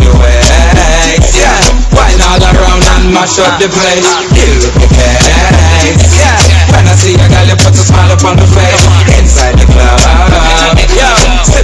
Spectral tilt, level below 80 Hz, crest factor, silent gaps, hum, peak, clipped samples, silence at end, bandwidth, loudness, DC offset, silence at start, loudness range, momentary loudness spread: -4 dB/octave; -8 dBFS; 4 dB; none; none; 0 dBFS; 20%; 0 s; 11 kHz; -5 LUFS; under 0.1%; 0 s; 1 LU; 2 LU